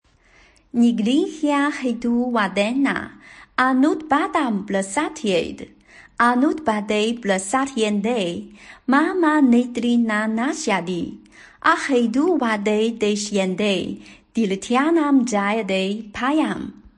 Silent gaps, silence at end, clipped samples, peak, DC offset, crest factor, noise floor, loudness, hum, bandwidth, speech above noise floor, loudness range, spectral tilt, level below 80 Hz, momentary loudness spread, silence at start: none; 0.1 s; under 0.1%; -4 dBFS; under 0.1%; 16 dB; -54 dBFS; -20 LUFS; none; 10.5 kHz; 34 dB; 2 LU; -4.5 dB/octave; -56 dBFS; 10 LU; 0.75 s